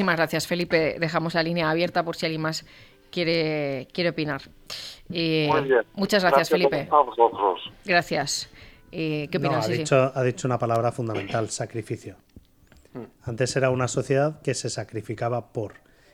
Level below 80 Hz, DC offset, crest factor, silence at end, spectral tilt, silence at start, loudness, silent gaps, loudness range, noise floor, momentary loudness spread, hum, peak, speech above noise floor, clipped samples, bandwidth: -58 dBFS; under 0.1%; 20 dB; 0.4 s; -5 dB/octave; 0 s; -24 LUFS; none; 6 LU; -56 dBFS; 13 LU; none; -4 dBFS; 31 dB; under 0.1%; 17 kHz